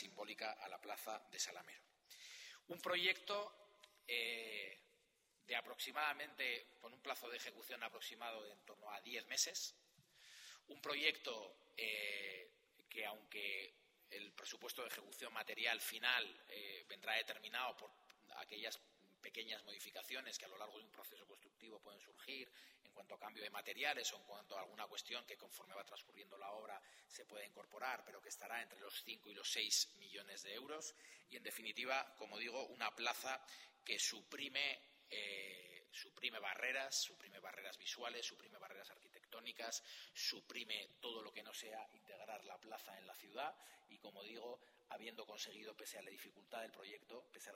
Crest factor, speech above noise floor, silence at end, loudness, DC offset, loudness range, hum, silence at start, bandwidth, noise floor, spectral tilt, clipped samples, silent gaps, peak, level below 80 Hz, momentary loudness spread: 28 dB; 31 dB; 0 s; -47 LUFS; under 0.1%; 9 LU; none; 0 s; 16 kHz; -80 dBFS; 0.5 dB/octave; under 0.1%; none; -20 dBFS; under -90 dBFS; 18 LU